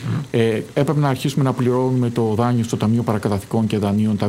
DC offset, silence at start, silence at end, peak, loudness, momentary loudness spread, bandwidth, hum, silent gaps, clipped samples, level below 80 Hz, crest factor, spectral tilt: under 0.1%; 0 s; 0 s; -6 dBFS; -19 LUFS; 2 LU; 16 kHz; none; none; under 0.1%; -54 dBFS; 14 dB; -7.5 dB/octave